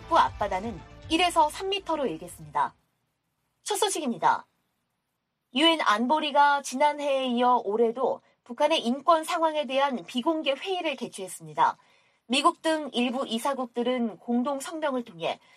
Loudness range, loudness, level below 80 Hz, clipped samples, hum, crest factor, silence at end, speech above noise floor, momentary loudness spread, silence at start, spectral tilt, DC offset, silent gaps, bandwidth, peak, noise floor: 5 LU; -26 LUFS; -58 dBFS; under 0.1%; none; 18 dB; 0.2 s; 54 dB; 10 LU; 0 s; -3 dB/octave; under 0.1%; none; 14.5 kHz; -8 dBFS; -80 dBFS